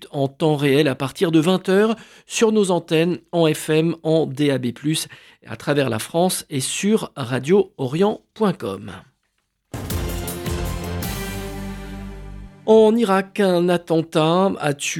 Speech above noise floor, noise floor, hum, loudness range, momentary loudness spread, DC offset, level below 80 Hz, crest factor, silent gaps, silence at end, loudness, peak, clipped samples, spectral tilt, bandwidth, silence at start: 52 dB; -71 dBFS; none; 9 LU; 14 LU; under 0.1%; -40 dBFS; 18 dB; none; 0 s; -20 LUFS; -2 dBFS; under 0.1%; -5.5 dB/octave; 18 kHz; 0 s